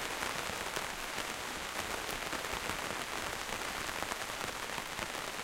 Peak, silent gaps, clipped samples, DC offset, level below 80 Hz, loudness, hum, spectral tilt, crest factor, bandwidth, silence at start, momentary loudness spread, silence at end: -14 dBFS; none; under 0.1%; under 0.1%; -56 dBFS; -37 LUFS; none; -1.5 dB/octave; 26 dB; 16.5 kHz; 0 s; 2 LU; 0 s